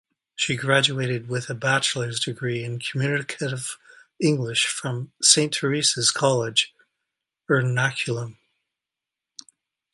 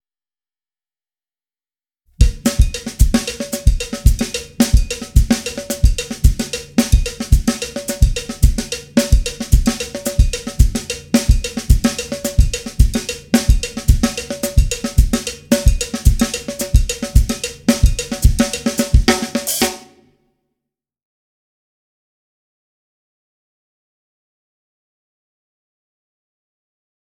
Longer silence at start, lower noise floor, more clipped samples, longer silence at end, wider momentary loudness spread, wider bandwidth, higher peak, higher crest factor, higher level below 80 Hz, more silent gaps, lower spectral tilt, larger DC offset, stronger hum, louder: second, 0.4 s vs 2.2 s; about the same, -88 dBFS vs under -90 dBFS; neither; second, 1.6 s vs 7.2 s; first, 11 LU vs 5 LU; second, 11.5 kHz vs 18 kHz; about the same, -2 dBFS vs 0 dBFS; first, 24 dB vs 16 dB; second, -66 dBFS vs -18 dBFS; neither; second, -3 dB/octave vs -5 dB/octave; neither; neither; second, -22 LUFS vs -18 LUFS